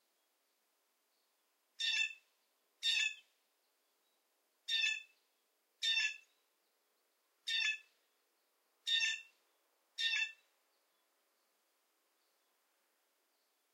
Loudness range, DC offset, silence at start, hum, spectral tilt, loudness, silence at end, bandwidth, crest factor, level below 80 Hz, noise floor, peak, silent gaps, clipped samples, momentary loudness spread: 5 LU; under 0.1%; 1.8 s; none; 8 dB/octave; -36 LUFS; 3.4 s; 16 kHz; 22 dB; under -90 dBFS; -81 dBFS; -22 dBFS; none; under 0.1%; 15 LU